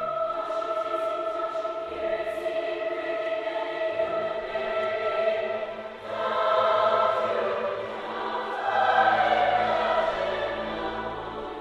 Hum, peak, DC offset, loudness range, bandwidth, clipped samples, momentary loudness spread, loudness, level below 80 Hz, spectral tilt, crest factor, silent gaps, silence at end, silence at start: none; -8 dBFS; under 0.1%; 5 LU; 10 kHz; under 0.1%; 10 LU; -27 LUFS; -58 dBFS; -4.5 dB/octave; 18 dB; none; 0 s; 0 s